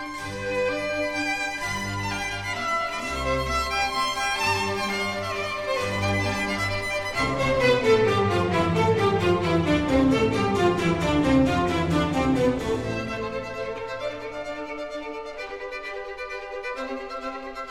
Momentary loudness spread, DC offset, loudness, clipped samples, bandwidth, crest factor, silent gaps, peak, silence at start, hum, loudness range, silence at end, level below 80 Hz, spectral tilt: 12 LU; 0.3%; -25 LUFS; under 0.1%; 17 kHz; 16 dB; none; -8 dBFS; 0 s; none; 11 LU; 0 s; -42 dBFS; -5 dB/octave